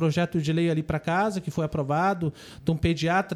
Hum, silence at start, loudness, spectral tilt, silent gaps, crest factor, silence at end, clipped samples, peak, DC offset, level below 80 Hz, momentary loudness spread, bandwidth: none; 0 s; -26 LUFS; -6.5 dB/octave; none; 14 dB; 0 s; under 0.1%; -12 dBFS; under 0.1%; -48 dBFS; 5 LU; 12.5 kHz